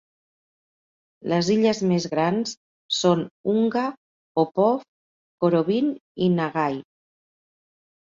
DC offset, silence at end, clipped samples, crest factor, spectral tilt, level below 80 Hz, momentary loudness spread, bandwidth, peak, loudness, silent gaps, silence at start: under 0.1%; 1.3 s; under 0.1%; 18 dB; -6 dB/octave; -66 dBFS; 9 LU; 7.6 kHz; -6 dBFS; -23 LUFS; 2.57-2.89 s, 3.31-3.44 s, 3.97-4.35 s, 4.88-5.38 s, 6.01-6.15 s; 1.25 s